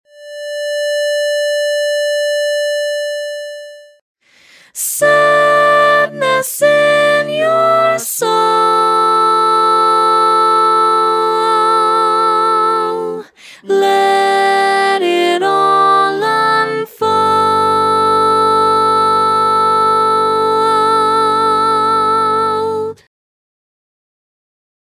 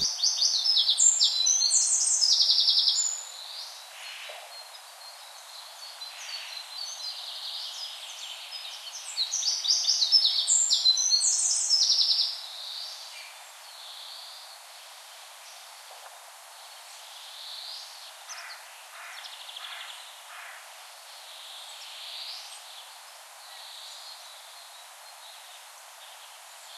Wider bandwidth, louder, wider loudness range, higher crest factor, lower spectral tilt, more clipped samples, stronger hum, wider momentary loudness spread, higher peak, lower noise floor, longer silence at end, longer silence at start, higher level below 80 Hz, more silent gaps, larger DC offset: about the same, 16 kHz vs 16 kHz; first, -12 LUFS vs -23 LUFS; second, 6 LU vs 22 LU; second, 12 dB vs 22 dB; first, -3 dB/octave vs 5 dB/octave; neither; neither; second, 8 LU vs 25 LU; first, 0 dBFS vs -8 dBFS; about the same, -46 dBFS vs -48 dBFS; first, 1.95 s vs 0 s; first, 0.2 s vs 0 s; first, -58 dBFS vs -82 dBFS; first, 4.01-4.15 s vs none; neither